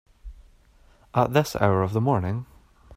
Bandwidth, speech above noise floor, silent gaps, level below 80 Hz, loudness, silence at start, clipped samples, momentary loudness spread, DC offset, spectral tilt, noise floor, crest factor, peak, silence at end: 16 kHz; 34 dB; none; -50 dBFS; -24 LUFS; 0.25 s; under 0.1%; 8 LU; under 0.1%; -7 dB/octave; -56 dBFS; 20 dB; -6 dBFS; 0 s